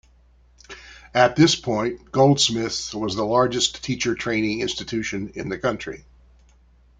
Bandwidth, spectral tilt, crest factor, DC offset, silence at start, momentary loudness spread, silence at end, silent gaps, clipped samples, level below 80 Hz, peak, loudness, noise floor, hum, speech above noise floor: 9.6 kHz; -4 dB/octave; 20 dB; under 0.1%; 0.7 s; 17 LU; 1 s; none; under 0.1%; -50 dBFS; -2 dBFS; -22 LUFS; -55 dBFS; none; 33 dB